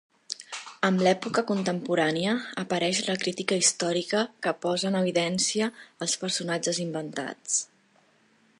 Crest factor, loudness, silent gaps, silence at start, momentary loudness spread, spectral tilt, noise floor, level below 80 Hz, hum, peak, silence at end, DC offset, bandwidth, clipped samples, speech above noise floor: 22 dB; -27 LUFS; none; 0.3 s; 11 LU; -3.5 dB/octave; -63 dBFS; -74 dBFS; none; -6 dBFS; 0.95 s; under 0.1%; 11.5 kHz; under 0.1%; 36 dB